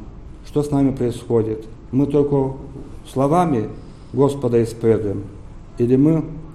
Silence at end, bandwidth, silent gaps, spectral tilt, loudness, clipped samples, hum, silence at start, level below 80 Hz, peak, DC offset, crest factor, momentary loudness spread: 0 s; 13 kHz; none; -8.5 dB/octave; -19 LUFS; under 0.1%; none; 0 s; -40 dBFS; -4 dBFS; under 0.1%; 16 dB; 18 LU